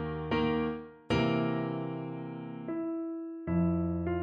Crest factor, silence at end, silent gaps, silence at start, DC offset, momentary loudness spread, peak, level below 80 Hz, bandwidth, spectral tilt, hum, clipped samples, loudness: 16 dB; 0 s; none; 0 s; under 0.1%; 10 LU; -16 dBFS; -52 dBFS; 8.6 kHz; -8 dB/octave; none; under 0.1%; -33 LUFS